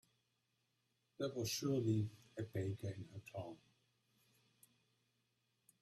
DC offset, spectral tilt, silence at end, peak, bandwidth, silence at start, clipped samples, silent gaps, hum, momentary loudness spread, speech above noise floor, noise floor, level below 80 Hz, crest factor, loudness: under 0.1%; -5.5 dB/octave; 2.25 s; -26 dBFS; 14 kHz; 1.2 s; under 0.1%; none; none; 14 LU; 42 dB; -84 dBFS; -78 dBFS; 20 dB; -43 LUFS